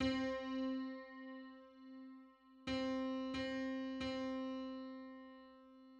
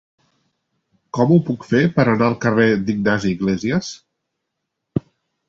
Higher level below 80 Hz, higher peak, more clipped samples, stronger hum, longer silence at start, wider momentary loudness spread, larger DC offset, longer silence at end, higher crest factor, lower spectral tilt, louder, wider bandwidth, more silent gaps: second, -68 dBFS vs -50 dBFS; second, -26 dBFS vs -2 dBFS; neither; neither; second, 0 s vs 1.15 s; first, 18 LU vs 12 LU; neither; second, 0 s vs 0.5 s; about the same, 18 dB vs 18 dB; second, -5.5 dB/octave vs -7 dB/octave; second, -44 LUFS vs -18 LUFS; about the same, 8 kHz vs 7.8 kHz; neither